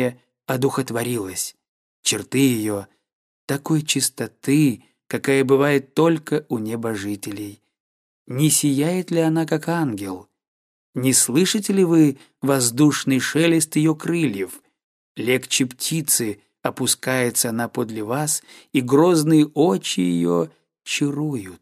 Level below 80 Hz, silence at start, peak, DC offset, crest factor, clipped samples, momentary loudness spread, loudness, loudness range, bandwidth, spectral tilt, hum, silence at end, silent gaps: -66 dBFS; 0 s; -2 dBFS; under 0.1%; 20 dB; under 0.1%; 12 LU; -20 LUFS; 4 LU; 15.5 kHz; -4.5 dB/octave; none; 0.05 s; 1.68-2.03 s, 3.13-3.48 s, 7.80-8.26 s, 10.48-10.93 s, 14.84-15.15 s